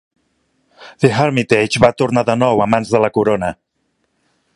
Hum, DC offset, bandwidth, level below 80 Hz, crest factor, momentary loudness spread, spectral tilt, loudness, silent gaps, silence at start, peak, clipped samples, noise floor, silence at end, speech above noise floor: none; under 0.1%; 11.5 kHz; -48 dBFS; 16 dB; 4 LU; -6 dB/octave; -15 LUFS; none; 0.8 s; 0 dBFS; under 0.1%; -67 dBFS; 1 s; 53 dB